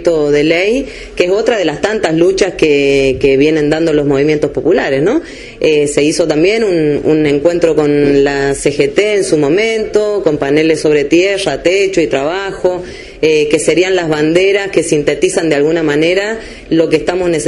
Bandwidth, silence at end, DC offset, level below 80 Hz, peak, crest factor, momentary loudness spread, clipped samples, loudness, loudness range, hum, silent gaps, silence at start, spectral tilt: 11.5 kHz; 0 s; under 0.1%; -38 dBFS; 0 dBFS; 12 dB; 5 LU; under 0.1%; -12 LUFS; 1 LU; none; none; 0 s; -5 dB/octave